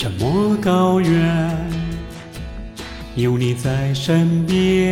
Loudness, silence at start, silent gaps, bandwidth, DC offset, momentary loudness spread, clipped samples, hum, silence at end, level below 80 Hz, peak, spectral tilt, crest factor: -18 LUFS; 0 s; none; 15.5 kHz; under 0.1%; 17 LU; under 0.1%; none; 0 s; -36 dBFS; -4 dBFS; -7 dB/octave; 14 dB